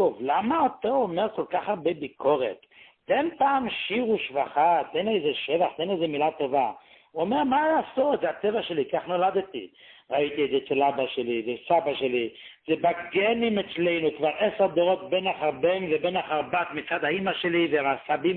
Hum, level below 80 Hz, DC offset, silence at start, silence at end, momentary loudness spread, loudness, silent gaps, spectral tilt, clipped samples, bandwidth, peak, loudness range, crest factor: none; -66 dBFS; under 0.1%; 0 s; 0 s; 6 LU; -26 LUFS; none; -9.5 dB/octave; under 0.1%; 4.4 kHz; -10 dBFS; 2 LU; 16 dB